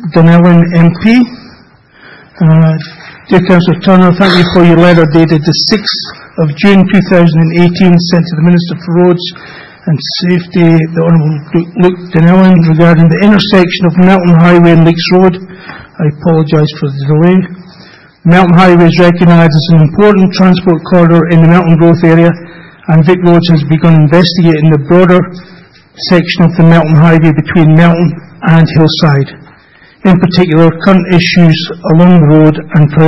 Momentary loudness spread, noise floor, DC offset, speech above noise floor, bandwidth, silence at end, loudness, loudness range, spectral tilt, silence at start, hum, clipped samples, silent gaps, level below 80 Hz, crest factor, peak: 9 LU; -40 dBFS; 1%; 35 dB; 6 kHz; 0 s; -6 LUFS; 4 LU; -8 dB/octave; 0 s; none; 4%; none; -36 dBFS; 6 dB; 0 dBFS